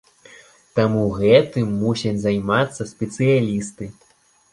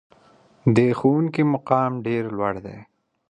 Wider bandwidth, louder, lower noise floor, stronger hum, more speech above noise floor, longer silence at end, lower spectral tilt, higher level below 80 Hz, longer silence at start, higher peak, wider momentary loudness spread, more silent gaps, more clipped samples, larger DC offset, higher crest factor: first, 11.5 kHz vs 9.6 kHz; about the same, -20 LUFS vs -21 LUFS; second, -48 dBFS vs -55 dBFS; neither; second, 29 dB vs 34 dB; about the same, 0.6 s vs 0.5 s; second, -6.5 dB/octave vs -8.5 dB/octave; first, -50 dBFS vs -58 dBFS; about the same, 0.75 s vs 0.65 s; about the same, -2 dBFS vs -4 dBFS; first, 13 LU vs 8 LU; neither; neither; neither; about the same, 18 dB vs 18 dB